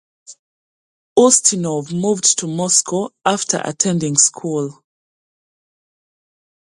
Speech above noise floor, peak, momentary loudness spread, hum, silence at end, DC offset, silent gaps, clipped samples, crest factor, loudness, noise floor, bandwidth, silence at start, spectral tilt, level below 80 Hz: over 73 dB; 0 dBFS; 11 LU; none; 2.05 s; under 0.1%; 0.39-1.16 s; under 0.1%; 20 dB; -15 LUFS; under -90 dBFS; 11.5 kHz; 0.3 s; -3 dB/octave; -62 dBFS